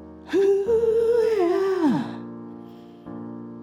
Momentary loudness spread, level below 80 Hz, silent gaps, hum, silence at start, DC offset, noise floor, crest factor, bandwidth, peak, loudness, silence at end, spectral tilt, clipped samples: 20 LU; -56 dBFS; none; none; 0 s; under 0.1%; -42 dBFS; 12 dB; 14.5 kHz; -12 dBFS; -21 LUFS; 0 s; -7 dB/octave; under 0.1%